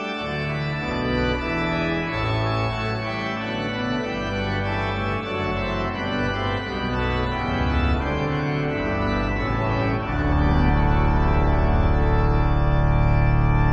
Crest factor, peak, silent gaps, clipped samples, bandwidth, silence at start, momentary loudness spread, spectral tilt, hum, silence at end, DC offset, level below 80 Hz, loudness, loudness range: 14 dB; -8 dBFS; none; under 0.1%; 7.4 kHz; 0 s; 6 LU; -7.5 dB/octave; none; 0 s; under 0.1%; -26 dBFS; -23 LUFS; 4 LU